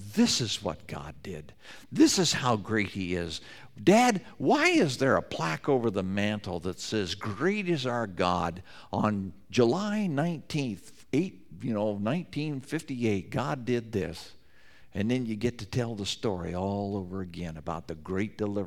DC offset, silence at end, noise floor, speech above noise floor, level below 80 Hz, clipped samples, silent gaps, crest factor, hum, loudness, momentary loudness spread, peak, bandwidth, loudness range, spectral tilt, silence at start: 0.3%; 0 s; -58 dBFS; 29 dB; -58 dBFS; under 0.1%; none; 20 dB; none; -29 LUFS; 15 LU; -8 dBFS; 16 kHz; 7 LU; -5 dB/octave; 0 s